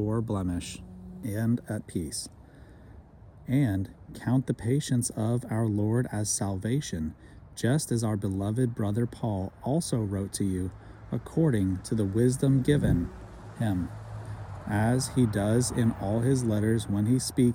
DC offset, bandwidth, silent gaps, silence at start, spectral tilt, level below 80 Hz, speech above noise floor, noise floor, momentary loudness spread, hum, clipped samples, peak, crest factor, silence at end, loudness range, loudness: under 0.1%; 17 kHz; none; 0 s; -6 dB/octave; -50 dBFS; 23 dB; -50 dBFS; 13 LU; none; under 0.1%; -12 dBFS; 16 dB; 0 s; 5 LU; -28 LUFS